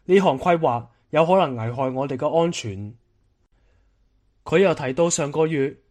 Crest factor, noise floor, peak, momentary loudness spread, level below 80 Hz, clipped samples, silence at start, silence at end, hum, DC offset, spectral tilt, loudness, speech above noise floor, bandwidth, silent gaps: 18 dB; -64 dBFS; -4 dBFS; 11 LU; -58 dBFS; under 0.1%; 0.1 s; 0.15 s; none; under 0.1%; -5.5 dB/octave; -21 LUFS; 43 dB; 11 kHz; none